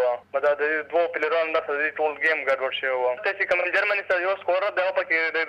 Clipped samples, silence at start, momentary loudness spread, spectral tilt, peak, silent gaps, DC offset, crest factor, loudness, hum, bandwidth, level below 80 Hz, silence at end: under 0.1%; 0 s; 3 LU; -3.5 dB/octave; -12 dBFS; none; under 0.1%; 12 dB; -23 LUFS; none; 8.6 kHz; -70 dBFS; 0 s